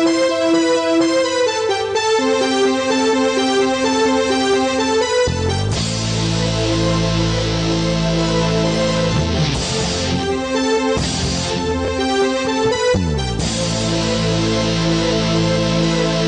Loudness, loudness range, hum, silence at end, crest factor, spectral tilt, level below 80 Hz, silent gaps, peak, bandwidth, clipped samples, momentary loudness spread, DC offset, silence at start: -17 LUFS; 2 LU; none; 0 s; 12 dB; -4.5 dB/octave; -32 dBFS; none; -6 dBFS; 10 kHz; under 0.1%; 3 LU; under 0.1%; 0 s